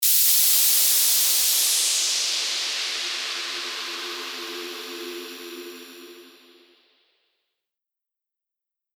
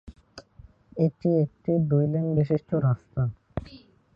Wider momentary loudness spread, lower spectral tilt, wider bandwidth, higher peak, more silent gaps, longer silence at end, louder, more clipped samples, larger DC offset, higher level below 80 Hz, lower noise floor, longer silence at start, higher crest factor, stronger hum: first, 20 LU vs 14 LU; second, 3.5 dB/octave vs -11 dB/octave; first, over 20 kHz vs 6.6 kHz; first, -6 dBFS vs -10 dBFS; neither; first, 2.7 s vs 0.4 s; first, -19 LUFS vs -25 LUFS; neither; neither; second, -80 dBFS vs -50 dBFS; first, -87 dBFS vs -53 dBFS; about the same, 0 s vs 0.05 s; about the same, 20 dB vs 16 dB; neither